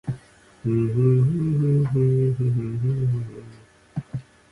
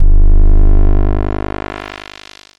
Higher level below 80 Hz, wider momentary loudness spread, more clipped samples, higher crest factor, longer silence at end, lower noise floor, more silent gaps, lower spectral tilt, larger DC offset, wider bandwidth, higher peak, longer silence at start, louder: second, -50 dBFS vs -8 dBFS; about the same, 17 LU vs 17 LU; neither; first, 14 dB vs 8 dB; second, 0.3 s vs 0.6 s; first, -48 dBFS vs -37 dBFS; neither; first, -10.5 dB/octave vs -8 dB/octave; neither; second, 3.5 kHz vs 4.7 kHz; second, -8 dBFS vs 0 dBFS; about the same, 0.05 s vs 0 s; second, -22 LUFS vs -16 LUFS